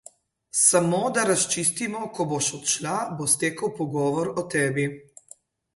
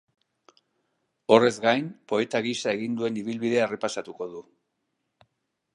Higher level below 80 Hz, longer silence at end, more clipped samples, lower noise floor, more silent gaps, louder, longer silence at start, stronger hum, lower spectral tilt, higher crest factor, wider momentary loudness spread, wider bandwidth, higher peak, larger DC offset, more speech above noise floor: first, -66 dBFS vs -76 dBFS; second, 0.75 s vs 1.35 s; neither; second, -53 dBFS vs -78 dBFS; neither; about the same, -23 LUFS vs -25 LUFS; second, 0.55 s vs 1.3 s; neither; second, -3 dB/octave vs -4.5 dB/octave; about the same, 20 dB vs 24 dB; second, 10 LU vs 17 LU; about the same, 12 kHz vs 11 kHz; about the same, -6 dBFS vs -4 dBFS; neither; second, 29 dB vs 53 dB